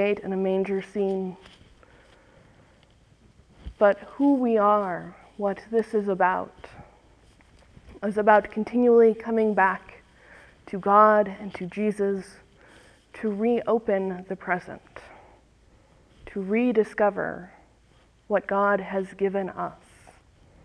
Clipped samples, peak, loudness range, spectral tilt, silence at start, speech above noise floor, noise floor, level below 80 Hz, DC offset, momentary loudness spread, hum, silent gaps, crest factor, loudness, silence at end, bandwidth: under 0.1%; -4 dBFS; 7 LU; -7.5 dB/octave; 0 s; 35 dB; -59 dBFS; -58 dBFS; under 0.1%; 15 LU; none; none; 22 dB; -24 LUFS; 0.9 s; 10.5 kHz